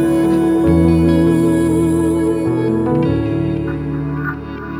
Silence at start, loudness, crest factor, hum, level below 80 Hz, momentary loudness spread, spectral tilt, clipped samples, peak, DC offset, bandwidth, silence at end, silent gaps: 0 s; -15 LUFS; 12 dB; none; -32 dBFS; 9 LU; -8 dB/octave; under 0.1%; -2 dBFS; under 0.1%; 15 kHz; 0 s; none